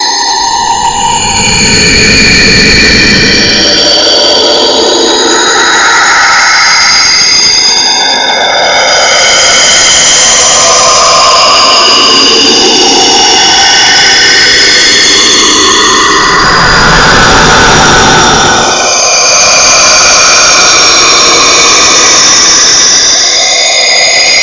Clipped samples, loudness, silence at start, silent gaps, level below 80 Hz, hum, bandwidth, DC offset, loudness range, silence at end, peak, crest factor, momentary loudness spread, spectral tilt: 4%; -2 LUFS; 0 s; none; -26 dBFS; none; 8 kHz; under 0.1%; 2 LU; 0 s; 0 dBFS; 4 dB; 4 LU; -0.5 dB/octave